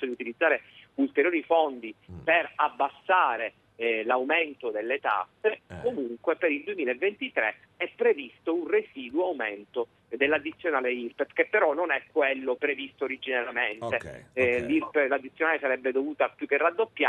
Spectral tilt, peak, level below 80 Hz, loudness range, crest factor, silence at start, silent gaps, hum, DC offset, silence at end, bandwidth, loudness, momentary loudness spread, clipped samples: -6 dB/octave; -8 dBFS; -68 dBFS; 3 LU; 20 dB; 0 s; none; none; under 0.1%; 0 s; 9.2 kHz; -27 LUFS; 8 LU; under 0.1%